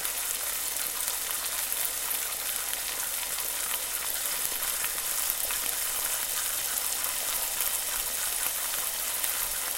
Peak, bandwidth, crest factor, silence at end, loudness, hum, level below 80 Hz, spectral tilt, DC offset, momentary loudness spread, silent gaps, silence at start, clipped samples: -4 dBFS; 17.5 kHz; 26 dB; 0 s; -28 LUFS; none; -56 dBFS; 2 dB/octave; under 0.1%; 2 LU; none; 0 s; under 0.1%